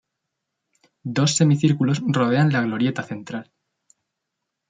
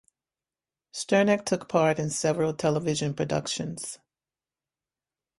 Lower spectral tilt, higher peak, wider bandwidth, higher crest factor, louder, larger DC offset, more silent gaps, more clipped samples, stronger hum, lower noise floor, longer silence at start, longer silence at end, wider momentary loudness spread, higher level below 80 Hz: about the same, -5.5 dB/octave vs -4.5 dB/octave; about the same, -6 dBFS vs -8 dBFS; second, 9.4 kHz vs 11.5 kHz; about the same, 18 dB vs 20 dB; first, -20 LUFS vs -26 LUFS; neither; neither; neither; neither; second, -81 dBFS vs under -90 dBFS; about the same, 1.05 s vs 0.95 s; second, 1.25 s vs 1.4 s; about the same, 15 LU vs 13 LU; about the same, -64 dBFS vs -64 dBFS